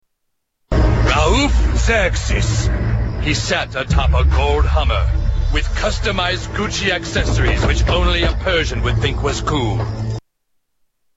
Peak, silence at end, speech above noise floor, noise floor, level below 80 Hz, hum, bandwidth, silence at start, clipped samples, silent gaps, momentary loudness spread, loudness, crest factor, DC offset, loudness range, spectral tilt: -2 dBFS; 0.95 s; 55 dB; -71 dBFS; -20 dBFS; none; 8 kHz; 0.7 s; under 0.1%; none; 5 LU; -17 LUFS; 14 dB; under 0.1%; 1 LU; -5 dB/octave